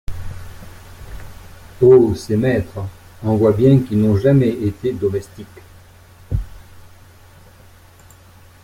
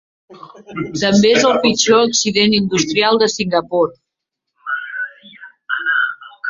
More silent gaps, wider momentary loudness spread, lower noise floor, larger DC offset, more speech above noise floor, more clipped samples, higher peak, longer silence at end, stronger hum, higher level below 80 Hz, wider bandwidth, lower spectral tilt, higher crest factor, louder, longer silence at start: neither; first, 25 LU vs 13 LU; second, -45 dBFS vs -79 dBFS; neither; second, 30 dB vs 64 dB; neither; about the same, -2 dBFS vs 0 dBFS; first, 1.85 s vs 0 s; neither; first, -38 dBFS vs -56 dBFS; first, 15.5 kHz vs 7.8 kHz; first, -8.5 dB/octave vs -3.5 dB/octave; about the same, 16 dB vs 16 dB; about the same, -16 LUFS vs -15 LUFS; second, 0.1 s vs 0.3 s